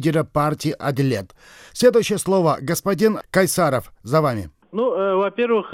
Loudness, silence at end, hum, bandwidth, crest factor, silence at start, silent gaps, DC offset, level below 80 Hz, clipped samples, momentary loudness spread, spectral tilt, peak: -20 LUFS; 0 s; none; 16 kHz; 18 dB; 0 s; none; under 0.1%; -52 dBFS; under 0.1%; 7 LU; -5.5 dB/octave; -2 dBFS